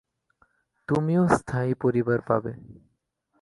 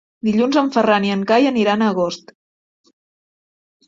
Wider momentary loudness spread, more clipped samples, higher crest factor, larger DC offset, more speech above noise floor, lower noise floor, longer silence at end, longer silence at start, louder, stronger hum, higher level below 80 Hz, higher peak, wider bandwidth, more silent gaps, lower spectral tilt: first, 16 LU vs 6 LU; neither; about the same, 20 dB vs 16 dB; neither; second, 49 dB vs over 74 dB; second, -73 dBFS vs under -90 dBFS; second, 0.7 s vs 1.7 s; first, 0.9 s vs 0.25 s; second, -25 LUFS vs -17 LUFS; neither; first, -56 dBFS vs -62 dBFS; second, -6 dBFS vs -2 dBFS; first, 11.5 kHz vs 7.6 kHz; neither; first, -8 dB/octave vs -6 dB/octave